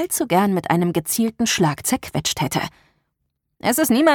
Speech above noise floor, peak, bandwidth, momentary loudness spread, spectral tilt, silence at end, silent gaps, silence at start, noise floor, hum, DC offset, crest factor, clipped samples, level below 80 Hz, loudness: 55 dB; -2 dBFS; 19 kHz; 5 LU; -4 dB/octave; 0 s; none; 0 s; -75 dBFS; none; under 0.1%; 18 dB; under 0.1%; -52 dBFS; -20 LUFS